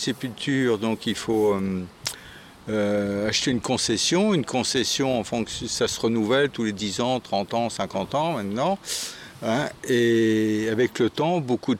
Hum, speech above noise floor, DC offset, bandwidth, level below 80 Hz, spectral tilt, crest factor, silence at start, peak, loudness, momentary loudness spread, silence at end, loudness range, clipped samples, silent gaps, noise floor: none; 21 dB; under 0.1%; 16.5 kHz; -56 dBFS; -4 dB/octave; 14 dB; 0 s; -10 dBFS; -24 LUFS; 8 LU; 0 s; 3 LU; under 0.1%; none; -45 dBFS